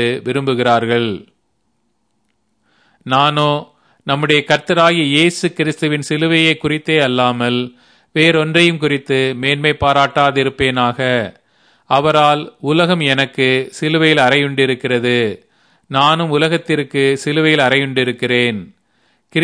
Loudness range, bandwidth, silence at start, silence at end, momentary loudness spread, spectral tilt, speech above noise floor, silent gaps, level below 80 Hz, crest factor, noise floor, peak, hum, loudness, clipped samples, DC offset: 4 LU; 11 kHz; 0 s; 0 s; 7 LU; -5 dB/octave; 52 dB; none; -50 dBFS; 16 dB; -66 dBFS; 0 dBFS; none; -14 LUFS; under 0.1%; under 0.1%